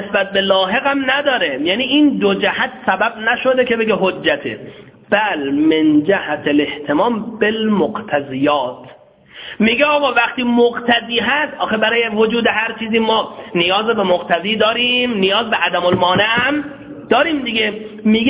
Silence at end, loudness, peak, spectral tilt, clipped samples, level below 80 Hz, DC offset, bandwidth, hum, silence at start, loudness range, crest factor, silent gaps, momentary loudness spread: 0 s; -15 LUFS; 0 dBFS; -8.5 dB/octave; under 0.1%; -52 dBFS; under 0.1%; 4 kHz; none; 0 s; 2 LU; 16 dB; none; 5 LU